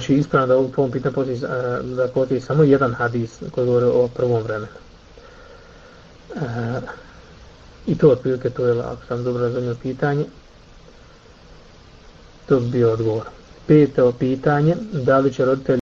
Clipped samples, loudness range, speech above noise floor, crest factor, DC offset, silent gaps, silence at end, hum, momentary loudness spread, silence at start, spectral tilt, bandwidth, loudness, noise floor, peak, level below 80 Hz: under 0.1%; 8 LU; 27 dB; 18 dB; under 0.1%; none; 0.15 s; none; 12 LU; 0 s; -8.5 dB/octave; 7.4 kHz; -20 LUFS; -46 dBFS; -2 dBFS; -48 dBFS